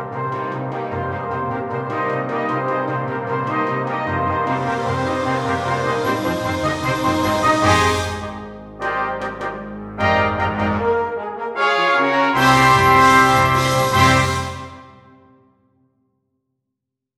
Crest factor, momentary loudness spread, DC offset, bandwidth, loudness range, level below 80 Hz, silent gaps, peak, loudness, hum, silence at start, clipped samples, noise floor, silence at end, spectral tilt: 18 dB; 13 LU; under 0.1%; 16 kHz; 8 LU; -44 dBFS; none; -2 dBFS; -18 LUFS; none; 0 s; under 0.1%; -80 dBFS; 2.25 s; -5 dB/octave